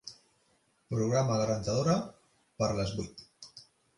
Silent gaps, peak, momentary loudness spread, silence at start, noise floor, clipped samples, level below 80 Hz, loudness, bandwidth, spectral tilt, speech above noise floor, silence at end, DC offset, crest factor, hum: none; -16 dBFS; 21 LU; 0.05 s; -71 dBFS; under 0.1%; -56 dBFS; -31 LUFS; 11.5 kHz; -6 dB/octave; 41 dB; 0.35 s; under 0.1%; 18 dB; none